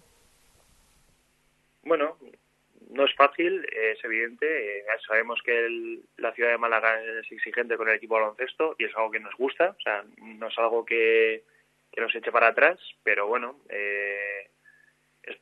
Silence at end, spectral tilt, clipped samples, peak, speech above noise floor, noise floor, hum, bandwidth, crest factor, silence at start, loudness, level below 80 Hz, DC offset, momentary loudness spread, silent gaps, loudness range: 0.05 s; -4 dB/octave; under 0.1%; -4 dBFS; 41 dB; -67 dBFS; none; 5 kHz; 24 dB; 1.85 s; -26 LUFS; -76 dBFS; under 0.1%; 12 LU; none; 3 LU